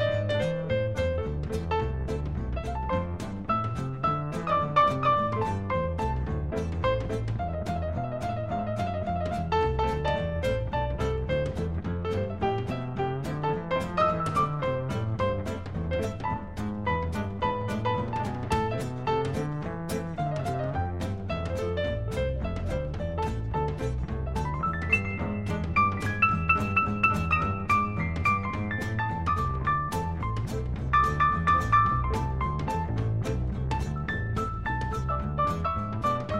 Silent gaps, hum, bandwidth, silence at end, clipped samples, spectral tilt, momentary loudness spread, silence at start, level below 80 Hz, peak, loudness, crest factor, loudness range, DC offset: none; none; 15 kHz; 0 s; under 0.1%; -7 dB/octave; 8 LU; 0 s; -38 dBFS; -10 dBFS; -28 LUFS; 18 dB; 5 LU; 0.4%